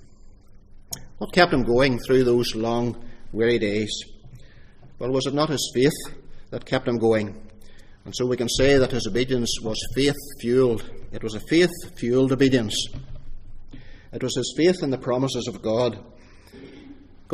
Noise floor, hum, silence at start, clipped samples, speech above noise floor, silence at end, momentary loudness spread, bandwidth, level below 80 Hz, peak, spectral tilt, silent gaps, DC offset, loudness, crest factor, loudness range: -46 dBFS; none; 0 s; under 0.1%; 24 dB; 0 s; 17 LU; 15.5 kHz; -40 dBFS; -2 dBFS; -5 dB/octave; none; under 0.1%; -23 LUFS; 22 dB; 4 LU